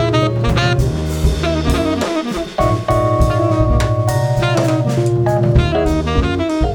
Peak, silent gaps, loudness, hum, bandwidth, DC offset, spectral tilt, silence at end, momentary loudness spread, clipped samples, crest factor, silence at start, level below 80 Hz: 0 dBFS; none; -16 LUFS; none; 18.5 kHz; under 0.1%; -6.5 dB/octave; 0 s; 4 LU; under 0.1%; 14 dB; 0 s; -22 dBFS